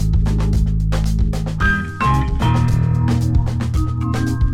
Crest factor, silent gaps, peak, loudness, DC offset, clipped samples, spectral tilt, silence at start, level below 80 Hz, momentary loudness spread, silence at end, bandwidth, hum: 12 dB; none; -4 dBFS; -18 LUFS; under 0.1%; under 0.1%; -7 dB/octave; 0 s; -20 dBFS; 3 LU; 0 s; 13 kHz; none